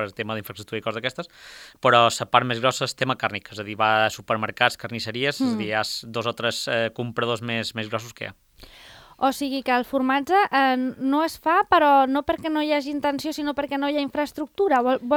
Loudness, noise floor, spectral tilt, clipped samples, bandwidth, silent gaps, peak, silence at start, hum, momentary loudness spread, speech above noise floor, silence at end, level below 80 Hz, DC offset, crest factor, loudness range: -23 LUFS; -47 dBFS; -4.5 dB/octave; under 0.1%; over 20 kHz; none; 0 dBFS; 0 s; none; 12 LU; 24 dB; 0 s; -58 dBFS; under 0.1%; 24 dB; 6 LU